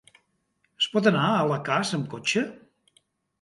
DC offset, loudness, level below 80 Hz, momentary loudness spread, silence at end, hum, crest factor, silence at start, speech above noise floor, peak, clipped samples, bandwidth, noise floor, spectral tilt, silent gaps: under 0.1%; -25 LUFS; -70 dBFS; 7 LU; 0.85 s; none; 22 dB; 0.8 s; 48 dB; -6 dBFS; under 0.1%; 11.5 kHz; -72 dBFS; -4.5 dB/octave; none